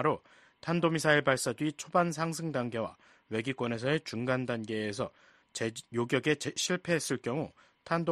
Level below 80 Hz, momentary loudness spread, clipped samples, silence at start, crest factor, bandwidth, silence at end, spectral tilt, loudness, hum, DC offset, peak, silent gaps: -68 dBFS; 10 LU; under 0.1%; 0 s; 22 dB; 13 kHz; 0 s; -4.5 dB/octave; -32 LUFS; none; under 0.1%; -10 dBFS; none